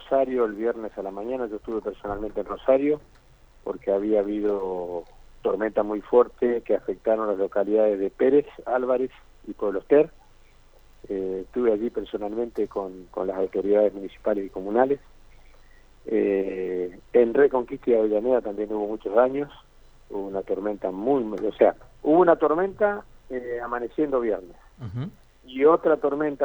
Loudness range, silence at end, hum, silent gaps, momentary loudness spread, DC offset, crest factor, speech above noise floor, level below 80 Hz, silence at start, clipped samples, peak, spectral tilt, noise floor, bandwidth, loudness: 4 LU; 0 s; none; none; 12 LU; under 0.1%; 20 dB; 29 dB; -52 dBFS; 0 s; under 0.1%; -4 dBFS; -8.5 dB/octave; -52 dBFS; 19.5 kHz; -25 LUFS